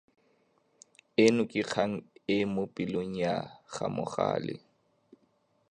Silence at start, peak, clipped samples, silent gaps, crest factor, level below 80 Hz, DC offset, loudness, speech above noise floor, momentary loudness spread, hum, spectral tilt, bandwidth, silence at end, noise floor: 1.2 s; -10 dBFS; under 0.1%; none; 22 dB; -66 dBFS; under 0.1%; -31 LUFS; 41 dB; 13 LU; none; -5.5 dB/octave; 10.5 kHz; 1.15 s; -71 dBFS